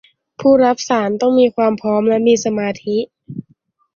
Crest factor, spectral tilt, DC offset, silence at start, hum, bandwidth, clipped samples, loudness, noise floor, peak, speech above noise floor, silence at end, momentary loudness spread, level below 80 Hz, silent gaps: 14 dB; -5 dB/octave; under 0.1%; 0.4 s; none; 7.4 kHz; under 0.1%; -15 LUFS; -57 dBFS; -2 dBFS; 43 dB; 0.55 s; 14 LU; -58 dBFS; none